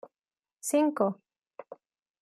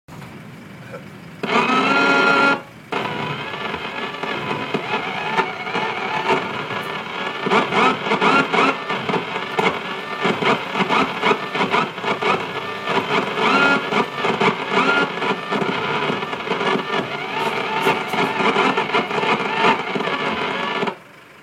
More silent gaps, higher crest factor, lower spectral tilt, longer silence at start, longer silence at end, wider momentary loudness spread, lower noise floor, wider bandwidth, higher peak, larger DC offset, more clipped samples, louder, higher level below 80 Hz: neither; about the same, 20 dB vs 18 dB; about the same, -5 dB/octave vs -4.5 dB/octave; about the same, 0.05 s vs 0.1 s; first, 0.5 s vs 0 s; first, 24 LU vs 10 LU; first, under -90 dBFS vs -41 dBFS; about the same, 15 kHz vs 16 kHz; second, -12 dBFS vs -4 dBFS; neither; neither; second, -29 LUFS vs -19 LUFS; second, -86 dBFS vs -62 dBFS